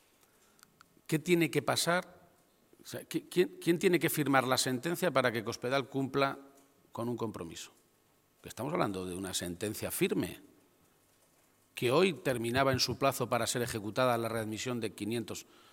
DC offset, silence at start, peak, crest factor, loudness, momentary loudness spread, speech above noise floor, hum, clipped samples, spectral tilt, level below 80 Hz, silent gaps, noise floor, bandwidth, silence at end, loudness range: under 0.1%; 1.1 s; -10 dBFS; 24 dB; -32 LUFS; 15 LU; 37 dB; none; under 0.1%; -4.5 dB/octave; -68 dBFS; none; -70 dBFS; 17 kHz; 0.3 s; 7 LU